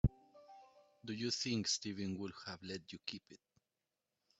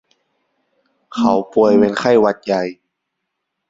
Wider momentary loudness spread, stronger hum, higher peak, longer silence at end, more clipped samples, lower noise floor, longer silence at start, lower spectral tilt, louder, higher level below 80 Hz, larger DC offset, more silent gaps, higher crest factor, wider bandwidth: first, 24 LU vs 9 LU; neither; second, -18 dBFS vs -2 dBFS; about the same, 1.05 s vs 0.95 s; neither; first, under -90 dBFS vs -76 dBFS; second, 0.05 s vs 1.15 s; second, -4 dB/octave vs -6.5 dB/octave; second, -41 LUFS vs -15 LUFS; about the same, -54 dBFS vs -56 dBFS; neither; neither; first, 26 dB vs 16 dB; about the same, 8.2 kHz vs 7.8 kHz